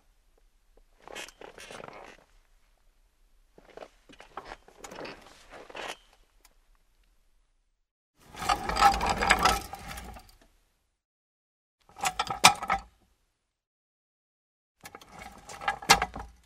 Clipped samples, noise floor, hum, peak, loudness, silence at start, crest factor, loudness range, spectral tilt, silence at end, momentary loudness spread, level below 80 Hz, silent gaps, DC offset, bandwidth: under 0.1%; -77 dBFS; none; 0 dBFS; -26 LUFS; 1.1 s; 32 dB; 20 LU; -1.5 dB/octave; 0.15 s; 26 LU; -50 dBFS; 7.91-8.14 s, 11.05-11.78 s, 13.67-14.75 s; under 0.1%; 16 kHz